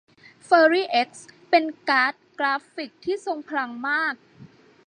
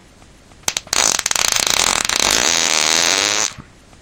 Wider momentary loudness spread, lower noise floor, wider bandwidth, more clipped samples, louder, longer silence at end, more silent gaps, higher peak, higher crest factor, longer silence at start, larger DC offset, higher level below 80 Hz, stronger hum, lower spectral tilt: first, 12 LU vs 9 LU; first, -50 dBFS vs -45 dBFS; second, 10 kHz vs over 20 kHz; neither; second, -23 LUFS vs -14 LUFS; about the same, 0.4 s vs 0.4 s; neither; second, -4 dBFS vs 0 dBFS; about the same, 20 dB vs 18 dB; second, 0.5 s vs 0.65 s; neither; second, -76 dBFS vs -44 dBFS; neither; first, -3.5 dB/octave vs 0.5 dB/octave